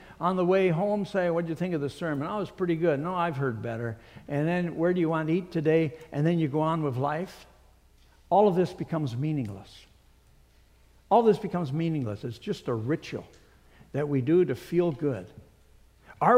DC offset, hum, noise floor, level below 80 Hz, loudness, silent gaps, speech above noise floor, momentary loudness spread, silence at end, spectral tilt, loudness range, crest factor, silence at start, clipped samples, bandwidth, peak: under 0.1%; none; -59 dBFS; -60 dBFS; -28 LUFS; none; 32 dB; 11 LU; 0 s; -8 dB/octave; 2 LU; 20 dB; 0 s; under 0.1%; 15 kHz; -8 dBFS